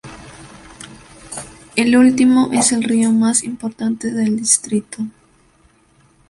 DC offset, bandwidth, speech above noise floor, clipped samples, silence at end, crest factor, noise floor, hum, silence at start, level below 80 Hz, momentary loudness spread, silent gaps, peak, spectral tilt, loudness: under 0.1%; 11.5 kHz; 39 dB; under 0.1%; 1.2 s; 18 dB; -54 dBFS; none; 0.05 s; -52 dBFS; 25 LU; none; 0 dBFS; -3.5 dB/octave; -15 LUFS